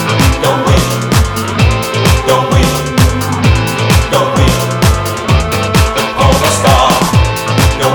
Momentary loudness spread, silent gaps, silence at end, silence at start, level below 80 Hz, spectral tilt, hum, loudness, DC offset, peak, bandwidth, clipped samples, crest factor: 3 LU; none; 0 s; 0 s; -18 dBFS; -5 dB/octave; none; -10 LUFS; under 0.1%; 0 dBFS; 19.5 kHz; under 0.1%; 10 dB